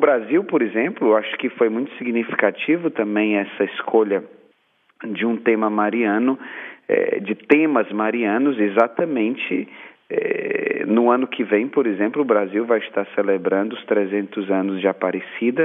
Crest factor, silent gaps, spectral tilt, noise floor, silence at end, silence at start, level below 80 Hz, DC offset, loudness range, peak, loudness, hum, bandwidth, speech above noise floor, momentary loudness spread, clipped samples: 20 dB; none; -8.5 dB/octave; -62 dBFS; 0 s; 0 s; -80 dBFS; under 0.1%; 2 LU; 0 dBFS; -20 LUFS; none; 3.8 kHz; 42 dB; 6 LU; under 0.1%